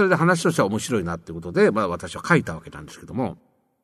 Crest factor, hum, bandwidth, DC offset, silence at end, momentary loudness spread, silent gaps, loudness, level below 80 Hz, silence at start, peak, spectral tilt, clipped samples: 20 dB; none; 13.5 kHz; under 0.1%; 0.5 s; 14 LU; none; -22 LUFS; -52 dBFS; 0 s; -4 dBFS; -5.5 dB/octave; under 0.1%